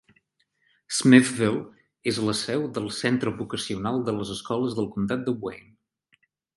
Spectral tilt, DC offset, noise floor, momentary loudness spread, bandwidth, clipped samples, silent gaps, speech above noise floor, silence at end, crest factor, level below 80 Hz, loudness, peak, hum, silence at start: -5 dB/octave; under 0.1%; -71 dBFS; 15 LU; 11.5 kHz; under 0.1%; none; 47 dB; 1 s; 24 dB; -60 dBFS; -25 LUFS; -2 dBFS; none; 0.9 s